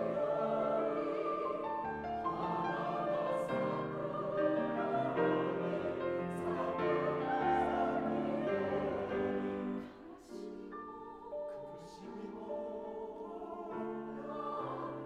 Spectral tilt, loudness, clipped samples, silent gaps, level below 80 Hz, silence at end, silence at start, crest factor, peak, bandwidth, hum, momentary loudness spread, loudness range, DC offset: -7.5 dB/octave; -37 LUFS; under 0.1%; none; -66 dBFS; 0 s; 0 s; 16 dB; -20 dBFS; 11 kHz; none; 13 LU; 10 LU; under 0.1%